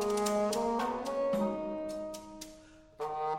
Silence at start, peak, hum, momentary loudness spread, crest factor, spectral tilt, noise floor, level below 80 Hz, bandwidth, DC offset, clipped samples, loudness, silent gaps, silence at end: 0 s; -20 dBFS; none; 15 LU; 14 dB; -4.5 dB/octave; -55 dBFS; -60 dBFS; 16 kHz; under 0.1%; under 0.1%; -34 LUFS; none; 0 s